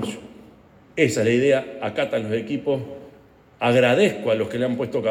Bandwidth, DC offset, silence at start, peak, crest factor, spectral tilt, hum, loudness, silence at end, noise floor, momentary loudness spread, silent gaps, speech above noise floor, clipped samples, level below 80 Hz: 16 kHz; under 0.1%; 0 s; -6 dBFS; 18 dB; -5.5 dB/octave; none; -21 LUFS; 0 s; -51 dBFS; 14 LU; none; 30 dB; under 0.1%; -62 dBFS